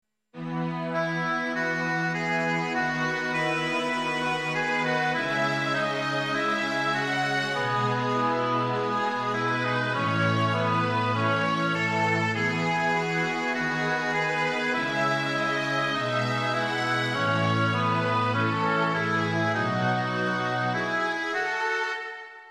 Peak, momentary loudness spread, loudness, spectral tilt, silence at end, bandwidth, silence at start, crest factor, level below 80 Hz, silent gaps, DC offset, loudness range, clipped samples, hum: -12 dBFS; 2 LU; -26 LUFS; -5.5 dB/octave; 0 s; 12.5 kHz; 0.35 s; 14 dB; -72 dBFS; none; under 0.1%; 2 LU; under 0.1%; none